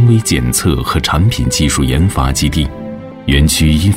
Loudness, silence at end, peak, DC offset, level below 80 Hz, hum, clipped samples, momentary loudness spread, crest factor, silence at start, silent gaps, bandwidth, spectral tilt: -13 LUFS; 0 s; -2 dBFS; 0.3%; -20 dBFS; none; under 0.1%; 9 LU; 10 dB; 0 s; none; 16.5 kHz; -4.5 dB/octave